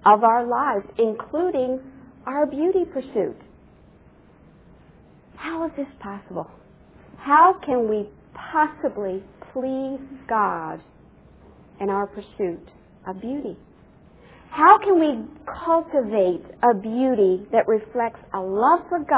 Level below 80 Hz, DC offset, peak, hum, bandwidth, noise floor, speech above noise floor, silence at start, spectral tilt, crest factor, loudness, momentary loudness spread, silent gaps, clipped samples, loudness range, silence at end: -56 dBFS; under 0.1%; -2 dBFS; none; 4 kHz; -52 dBFS; 30 dB; 0.05 s; -10 dB/octave; 22 dB; -22 LUFS; 19 LU; none; under 0.1%; 11 LU; 0 s